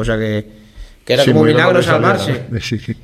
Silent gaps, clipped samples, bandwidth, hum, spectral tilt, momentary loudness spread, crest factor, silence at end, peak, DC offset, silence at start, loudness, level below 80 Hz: none; under 0.1%; 14.5 kHz; none; -6 dB/octave; 11 LU; 14 dB; 0.05 s; 0 dBFS; under 0.1%; 0 s; -14 LUFS; -38 dBFS